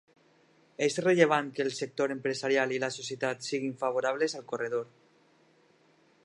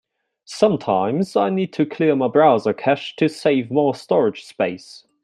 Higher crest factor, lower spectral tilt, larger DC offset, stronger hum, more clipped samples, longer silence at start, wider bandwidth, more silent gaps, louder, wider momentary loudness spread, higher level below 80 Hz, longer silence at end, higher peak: first, 24 dB vs 18 dB; second, -4 dB/octave vs -6.5 dB/octave; neither; neither; neither; first, 0.8 s vs 0.5 s; about the same, 11.5 kHz vs 11.5 kHz; neither; second, -30 LUFS vs -19 LUFS; about the same, 9 LU vs 9 LU; second, -82 dBFS vs -66 dBFS; first, 1.4 s vs 0.25 s; second, -8 dBFS vs -2 dBFS